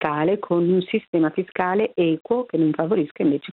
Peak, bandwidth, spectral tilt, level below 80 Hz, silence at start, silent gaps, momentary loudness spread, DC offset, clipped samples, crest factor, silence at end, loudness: -6 dBFS; 4.2 kHz; -10.5 dB/octave; -66 dBFS; 0 s; 1.08-1.13 s, 2.21-2.25 s, 3.11-3.15 s; 3 LU; under 0.1%; under 0.1%; 14 dB; 0 s; -22 LUFS